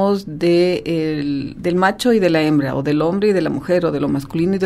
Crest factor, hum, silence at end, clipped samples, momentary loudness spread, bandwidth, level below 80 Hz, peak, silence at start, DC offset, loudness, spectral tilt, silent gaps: 16 dB; none; 0 s; under 0.1%; 6 LU; 14.5 kHz; -46 dBFS; -2 dBFS; 0 s; under 0.1%; -17 LUFS; -6.5 dB/octave; none